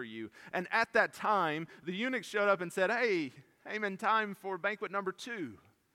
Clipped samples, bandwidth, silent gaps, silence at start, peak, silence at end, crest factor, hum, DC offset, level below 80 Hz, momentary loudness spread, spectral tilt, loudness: under 0.1%; 16.5 kHz; none; 0 s; -12 dBFS; 0.4 s; 22 dB; none; under 0.1%; -82 dBFS; 12 LU; -4.5 dB/octave; -33 LUFS